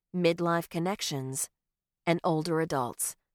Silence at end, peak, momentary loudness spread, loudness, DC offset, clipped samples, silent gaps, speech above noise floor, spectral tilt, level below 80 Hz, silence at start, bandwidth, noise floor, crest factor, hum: 0.2 s; -12 dBFS; 6 LU; -30 LUFS; under 0.1%; under 0.1%; none; 43 dB; -4.5 dB/octave; -68 dBFS; 0.15 s; 18 kHz; -72 dBFS; 18 dB; none